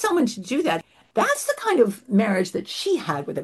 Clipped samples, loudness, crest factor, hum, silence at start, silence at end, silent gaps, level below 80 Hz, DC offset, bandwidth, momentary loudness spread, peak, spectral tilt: under 0.1%; -23 LUFS; 18 dB; none; 0 s; 0 s; none; -68 dBFS; under 0.1%; 12.5 kHz; 7 LU; -6 dBFS; -4.5 dB/octave